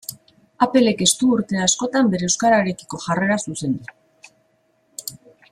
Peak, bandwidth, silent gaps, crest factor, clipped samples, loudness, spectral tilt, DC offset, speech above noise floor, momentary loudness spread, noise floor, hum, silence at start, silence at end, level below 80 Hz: -2 dBFS; 15.5 kHz; none; 20 dB; under 0.1%; -19 LUFS; -3.5 dB/octave; under 0.1%; 45 dB; 17 LU; -63 dBFS; none; 0.1 s; 0.35 s; -58 dBFS